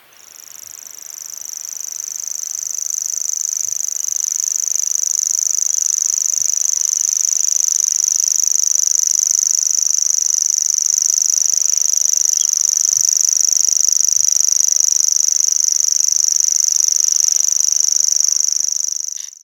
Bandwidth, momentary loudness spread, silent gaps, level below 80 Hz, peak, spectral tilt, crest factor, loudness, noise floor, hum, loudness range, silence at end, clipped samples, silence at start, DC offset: 19 kHz; 10 LU; none; -76 dBFS; 0 dBFS; 5.5 dB/octave; 16 dB; -13 LUFS; -40 dBFS; none; 7 LU; 0.1 s; under 0.1%; 0.4 s; under 0.1%